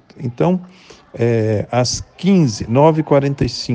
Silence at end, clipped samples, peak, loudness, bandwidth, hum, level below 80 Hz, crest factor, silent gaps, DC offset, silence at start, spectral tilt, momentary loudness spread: 0 s; under 0.1%; 0 dBFS; -16 LUFS; 9.8 kHz; none; -42 dBFS; 16 dB; none; under 0.1%; 0.15 s; -6 dB/octave; 7 LU